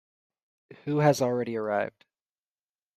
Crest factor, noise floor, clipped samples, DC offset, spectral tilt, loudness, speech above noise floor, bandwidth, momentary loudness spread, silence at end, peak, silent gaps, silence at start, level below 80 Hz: 20 dB; under -90 dBFS; under 0.1%; under 0.1%; -6 dB/octave; -27 LUFS; over 63 dB; 14 kHz; 11 LU; 1.05 s; -10 dBFS; none; 0.7 s; -72 dBFS